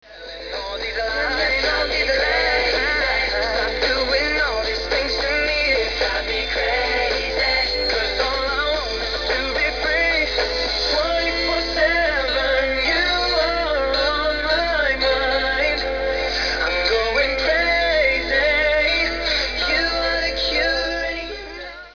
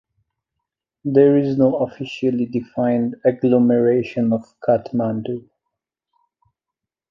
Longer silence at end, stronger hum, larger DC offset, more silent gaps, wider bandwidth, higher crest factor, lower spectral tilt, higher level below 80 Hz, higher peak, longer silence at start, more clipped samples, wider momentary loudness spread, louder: second, 0 s vs 1.7 s; neither; first, 0.3% vs under 0.1%; neither; second, 5.4 kHz vs 6.2 kHz; about the same, 14 dB vs 18 dB; second, -3 dB/octave vs -9 dB/octave; first, -34 dBFS vs -60 dBFS; second, -6 dBFS vs -2 dBFS; second, 0.05 s vs 1.05 s; neither; second, 5 LU vs 9 LU; about the same, -19 LUFS vs -19 LUFS